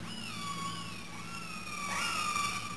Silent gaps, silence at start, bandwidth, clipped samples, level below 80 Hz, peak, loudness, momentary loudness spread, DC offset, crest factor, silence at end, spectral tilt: none; 0 s; 11 kHz; under 0.1%; -60 dBFS; -22 dBFS; -36 LUFS; 10 LU; 0.4%; 16 dB; 0 s; -2 dB/octave